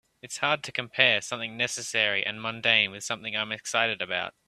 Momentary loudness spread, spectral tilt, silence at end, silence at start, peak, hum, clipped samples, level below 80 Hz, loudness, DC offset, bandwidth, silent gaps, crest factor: 9 LU; -1.5 dB/octave; 0.2 s; 0.25 s; -2 dBFS; none; under 0.1%; -72 dBFS; -26 LUFS; under 0.1%; 14.5 kHz; none; 26 dB